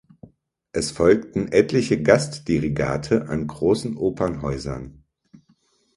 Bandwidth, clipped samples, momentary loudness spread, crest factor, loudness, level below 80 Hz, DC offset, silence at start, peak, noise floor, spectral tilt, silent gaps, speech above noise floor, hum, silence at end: 11.5 kHz; under 0.1%; 11 LU; 22 dB; -22 LUFS; -44 dBFS; under 0.1%; 0.75 s; 0 dBFS; -63 dBFS; -6 dB/octave; none; 42 dB; none; 1.05 s